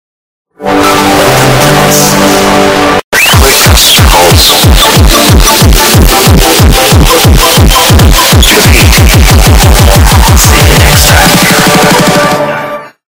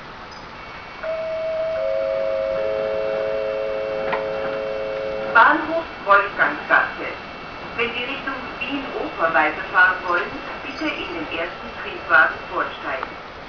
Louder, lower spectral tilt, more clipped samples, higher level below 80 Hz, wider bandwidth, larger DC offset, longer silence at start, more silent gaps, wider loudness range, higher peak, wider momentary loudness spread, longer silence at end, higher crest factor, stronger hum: first, -3 LUFS vs -21 LUFS; second, -3.5 dB/octave vs -5 dB/octave; first, 20% vs under 0.1%; first, -10 dBFS vs -50 dBFS; first, over 20 kHz vs 5.4 kHz; second, under 0.1% vs 0.1%; first, 0.6 s vs 0 s; first, 3.04-3.12 s vs none; second, 1 LU vs 5 LU; about the same, 0 dBFS vs 0 dBFS; second, 4 LU vs 15 LU; first, 0.2 s vs 0 s; second, 4 dB vs 22 dB; neither